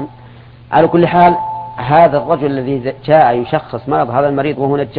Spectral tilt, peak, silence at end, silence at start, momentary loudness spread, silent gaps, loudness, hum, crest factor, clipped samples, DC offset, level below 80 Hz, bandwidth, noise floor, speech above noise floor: -10.5 dB/octave; 0 dBFS; 0 s; 0 s; 9 LU; none; -13 LUFS; none; 12 dB; under 0.1%; under 0.1%; -46 dBFS; 5 kHz; -37 dBFS; 25 dB